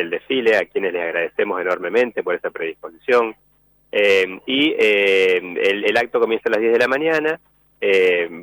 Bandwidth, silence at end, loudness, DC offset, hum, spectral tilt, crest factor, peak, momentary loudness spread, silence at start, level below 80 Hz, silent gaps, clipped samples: over 20 kHz; 0 s; -18 LUFS; under 0.1%; none; -4 dB/octave; 12 dB; -6 dBFS; 9 LU; 0 s; -64 dBFS; none; under 0.1%